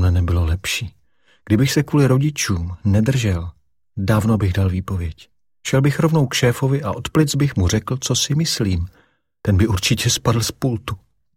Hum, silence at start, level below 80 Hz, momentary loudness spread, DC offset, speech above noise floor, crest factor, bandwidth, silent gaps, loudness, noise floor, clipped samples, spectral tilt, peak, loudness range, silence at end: none; 0 s; -34 dBFS; 10 LU; under 0.1%; 42 dB; 16 dB; 16.5 kHz; none; -19 LUFS; -60 dBFS; under 0.1%; -5 dB/octave; -4 dBFS; 2 LU; 0.4 s